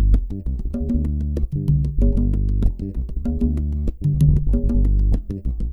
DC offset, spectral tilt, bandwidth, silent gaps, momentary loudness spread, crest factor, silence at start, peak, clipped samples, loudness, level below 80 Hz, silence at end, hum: under 0.1%; -10.5 dB/octave; 1.9 kHz; none; 9 LU; 16 dB; 0 s; -2 dBFS; under 0.1%; -22 LUFS; -20 dBFS; 0 s; none